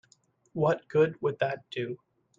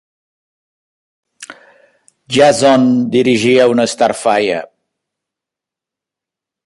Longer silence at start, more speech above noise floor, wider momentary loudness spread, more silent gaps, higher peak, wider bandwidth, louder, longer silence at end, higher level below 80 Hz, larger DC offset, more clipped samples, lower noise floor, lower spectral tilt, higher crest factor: second, 0.55 s vs 1.4 s; second, 38 dB vs 74 dB; first, 13 LU vs 7 LU; neither; second, -12 dBFS vs 0 dBFS; second, 7.4 kHz vs 11.5 kHz; second, -29 LUFS vs -12 LUFS; second, 0.45 s vs 2 s; second, -70 dBFS vs -58 dBFS; neither; neither; second, -66 dBFS vs -85 dBFS; first, -7.5 dB/octave vs -4.5 dB/octave; about the same, 18 dB vs 14 dB